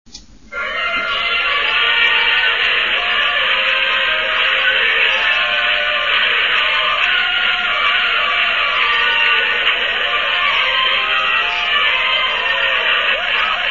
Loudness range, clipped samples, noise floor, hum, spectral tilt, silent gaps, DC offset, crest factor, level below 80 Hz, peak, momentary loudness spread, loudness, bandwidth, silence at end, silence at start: 1 LU; under 0.1%; -36 dBFS; none; -1 dB/octave; none; 0.6%; 14 dB; -48 dBFS; -2 dBFS; 3 LU; -13 LUFS; 7.4 kHz; 0 s; 0.15 s